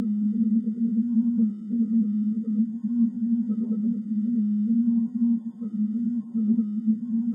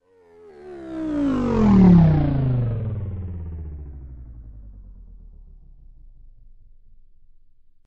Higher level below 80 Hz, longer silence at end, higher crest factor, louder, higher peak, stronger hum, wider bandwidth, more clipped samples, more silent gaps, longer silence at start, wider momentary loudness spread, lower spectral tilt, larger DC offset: second, -82 dBFS vs -36 dBFS; second, 0 s vs 2.95 s; second, 10 dB vs 18 dB; second, -25 LUFS vs -19 LUFS; second, -14 dBFS vs -4 dBFS; neither; second, 1.4 kHz vs 6 kHz; neither; neither; second, 0 s vs 0.6 s; second, 4 LU vs 28 LU; first, -12 dB/octave vs -10.5 dB/octave; neither